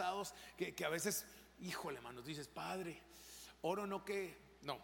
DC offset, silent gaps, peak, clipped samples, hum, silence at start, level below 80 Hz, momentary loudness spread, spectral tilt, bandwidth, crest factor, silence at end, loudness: under 0.1%; none; -26 dBFS; under 0.1%; none; 0 s; -72 dBFS; 13 LU; -3.5 dB/octave; 17 kHz; 20 dB; 0 s; -45 LUFS